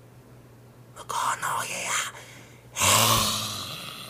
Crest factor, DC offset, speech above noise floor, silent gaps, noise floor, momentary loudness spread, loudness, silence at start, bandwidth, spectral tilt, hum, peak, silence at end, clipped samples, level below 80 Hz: 24 dB; under 0.1%; 25 dB; none; -50 dBFS; 20 LU; -24 LUFS; 0.05 s; 15.5 kHz; -1.5 dB/octave; none; -6 dBFS; 0 s; under 0.1%; -54 dBFS